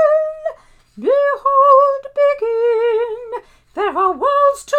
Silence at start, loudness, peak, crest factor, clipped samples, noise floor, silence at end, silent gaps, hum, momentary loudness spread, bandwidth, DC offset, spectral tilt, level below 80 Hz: 0 s; -15 LUFS; 0 dBFS; 16 dB; under 0.1%; -40 dBFS; 0 s; none; none; 17 LU; 10.5 kHz; under 0.1%; -3.5 dB/octave; -54 dBFS